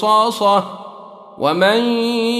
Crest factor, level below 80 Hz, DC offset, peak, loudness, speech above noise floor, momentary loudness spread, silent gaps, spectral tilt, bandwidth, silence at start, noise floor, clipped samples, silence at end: 14 dB; -64 dBFS; under 0.1%; -2 dBFS; -16 LUFS; 22 dB; 17 LU; none; -4.5 dB/octave; 14.5 kHz; 0 s; -37 dBFS; under 0.1%; 0 s